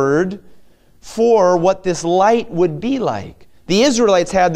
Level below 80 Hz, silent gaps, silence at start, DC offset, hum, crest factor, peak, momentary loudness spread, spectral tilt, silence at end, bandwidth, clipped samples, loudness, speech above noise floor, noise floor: -46 dBFS; none; 0 s; under 0.1%; none; 14 dB; -2 dBFS; 10 LU; -5 dB/octave; 0 s; 13.5 kHz; under 0.1%; -15 LUFS; 30 dB; -45 dBFS